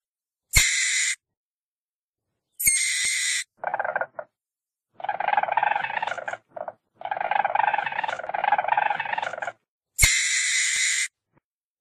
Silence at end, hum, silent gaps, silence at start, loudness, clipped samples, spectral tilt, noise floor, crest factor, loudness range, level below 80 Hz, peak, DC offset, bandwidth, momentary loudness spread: 0.75 s; none; 1.37-2.13 s, 9.68-9.81 s; 0.55 s; -23 LUFS; under 0.1%; 0.5 dB/octave; under -90 dBFS; 24 dB; 5 LU; -42 dBFS; -2 dBFS; under 0.1%; 14.5 kHz; 16 LU